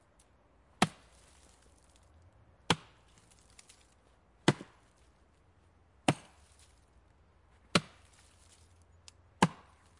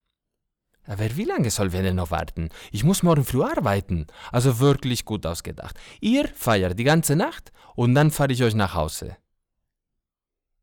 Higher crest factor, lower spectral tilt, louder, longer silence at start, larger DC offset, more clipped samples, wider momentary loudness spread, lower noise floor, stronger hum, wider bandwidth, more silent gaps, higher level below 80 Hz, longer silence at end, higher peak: first, 26 dB vs 14 dB; about the same, -4.5 dB/octave vs -5.5 dB/octave; second, -34 LUFS vs -23 LUFS; about the same, 0.8 s vs 0.9 s; neither; neither; first, 26 LU vs 14 LU; second, -66 dBFS vs -86 dBFS; neither; second, 11.5 kHz vs 19.5 kHz; neither; second, -66 dBFS vs -44 dBFS; second, 0.5 s vs 1.5 s; second, -14 dBFS vs -10 dBFS